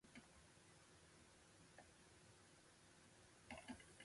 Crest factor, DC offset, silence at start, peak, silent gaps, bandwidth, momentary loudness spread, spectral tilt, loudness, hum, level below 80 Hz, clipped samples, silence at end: 24 dB; under 0.1%; 0 s; -40 dBFS; none; 11.5 kHz; 9 LU; -3.5 dB/octave; -65 LUFS; none; -80 dBFS; under 0.1%; 0 s